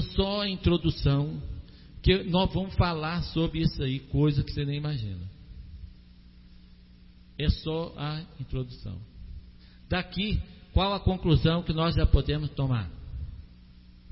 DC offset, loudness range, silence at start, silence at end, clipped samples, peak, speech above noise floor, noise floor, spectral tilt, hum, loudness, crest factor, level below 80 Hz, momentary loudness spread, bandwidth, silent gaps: under 0.1%; 8 LU; 0 s; 0 s; under 0.1%; -6 dBFS; 25 dB; -52 dBFS; -10.5 dB/octave; 60 Hz at -55 dBFS; -28 LUFS; 22 dB; -36 dBFS; 19 LU; 5.8 kHz; none